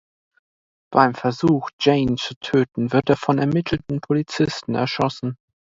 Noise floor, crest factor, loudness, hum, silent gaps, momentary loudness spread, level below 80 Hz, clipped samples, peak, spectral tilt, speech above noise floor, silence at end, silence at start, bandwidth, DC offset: under -90 dBFS; 20 dB; -21 LUFS; none; 1.73-1.79 s, 2.36-2.41 s; 7 LU; -50 dBFS; under 0.1%; 0 dBFS; -6.5 dB/octave; over 70 dB; 0.4 s; 0.9 s; 7.8 kHz; under 0.1%